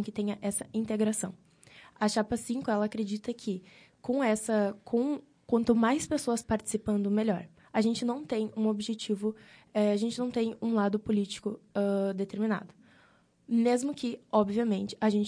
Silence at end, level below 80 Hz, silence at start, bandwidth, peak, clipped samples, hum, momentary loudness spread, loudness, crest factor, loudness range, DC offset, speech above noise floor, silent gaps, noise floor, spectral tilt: 0 s; -62 dBFS; 0 s; 10.5 kHz; -12 dBFS; under 0.1%; none; 8 LU; -31 LUFS; 18 dB; 3 LU; under 0.1%; 34 dB; none; -64 dBFS; -5.5 dB/octave